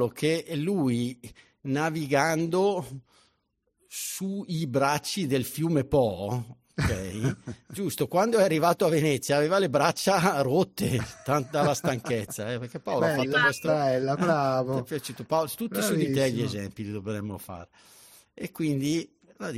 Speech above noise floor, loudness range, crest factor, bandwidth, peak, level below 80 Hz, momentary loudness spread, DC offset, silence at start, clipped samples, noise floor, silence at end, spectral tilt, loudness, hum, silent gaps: 48 dB; 5 LU; 18 dB; 16 kHz; -8 dBFS; -54 dBFS; 12 LU; under 0.1%; 0 s; under 0.1%; -75 dBFS; 0 s; -5 dB/octave; -27 LUFS; none; none